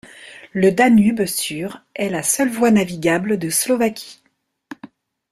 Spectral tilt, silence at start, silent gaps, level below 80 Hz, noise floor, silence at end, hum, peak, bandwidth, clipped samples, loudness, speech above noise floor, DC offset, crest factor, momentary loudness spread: -4.5 dB/octave; 0.05 s; none; -58 dBFS; -44 dBFS; 0.45 s; none; -2 dBFS; 15.5 kHz; under 0.1%; -18 LUFS; 26 dB; under 0.1%; 18 dB; 25 LU